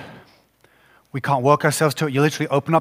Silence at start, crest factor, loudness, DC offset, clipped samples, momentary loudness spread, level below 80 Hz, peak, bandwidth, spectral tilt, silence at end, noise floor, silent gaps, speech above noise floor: 0 s; 20 dB; -19 LUFS; under 0.1%; under 0.1%; 8 LU; -64 dBFS; -2 dBFS; 16 kHz; -5.5 dB/octave; 0 s; -57 dBFS; none; 38 dB